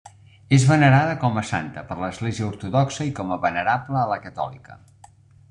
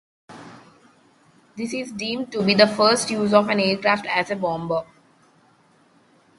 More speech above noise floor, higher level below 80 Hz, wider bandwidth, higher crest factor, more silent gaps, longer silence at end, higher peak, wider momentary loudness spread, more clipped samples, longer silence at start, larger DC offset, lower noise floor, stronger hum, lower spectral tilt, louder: second, 29 dB vs 37 dB; first, -54 dBFS vs -64 dBFS; about the same, 10.5 kHz vs 11.5 kHz; about the same, 18 dB vs 22 dB; neither; second, 0.75 s vs 1.55 s; second, -4 dBFS vs 0 dBFS; about the same, 14 LU vs 14 LU; neither; second, 0.05 s vs 0.3 s; neither; second, -51 dBFS vs -58 dBFS; neither; first, -6.5 dB/octave vs -4 dB/octave; about the same, -22 LUFS vs -21 LUFS